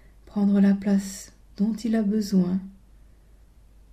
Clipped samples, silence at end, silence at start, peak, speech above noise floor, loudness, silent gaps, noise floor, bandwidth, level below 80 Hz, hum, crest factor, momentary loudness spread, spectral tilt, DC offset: under 0.1%; 1.2 s; 0.35 s; -10 dBFS; 30 dB; -24 LUFS; none; -53 dBFS; 14 kHz; -52 dBFS; none; 14 dB; 17 LU; -7.5 dB/octave; under 0.1%